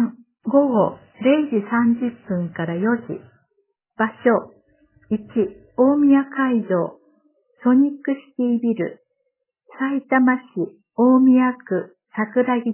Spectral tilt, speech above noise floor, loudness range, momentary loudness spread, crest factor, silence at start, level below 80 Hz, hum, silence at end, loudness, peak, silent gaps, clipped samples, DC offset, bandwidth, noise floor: -11 dB/octave; 56 dB; 4 LU; 11 LU; 16 dB; 0 s; -64 dBFS; none; 0 s; -20 LUFS; -4 dBFS; none; under 0.1%; under 0.1%; 3.2 kHz; -74 dBFS